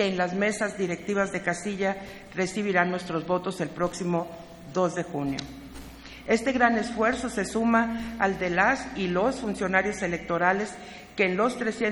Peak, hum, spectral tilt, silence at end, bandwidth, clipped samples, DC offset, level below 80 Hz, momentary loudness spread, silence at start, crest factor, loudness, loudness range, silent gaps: -6 dBFS; none; -5 dB/octave; 0 s; 19.5 kHz; under 0.1%; under 0.1%; -52 dBFS; 13 LU; 0 s; 20 dB; -27 LUFS; 4 LU; none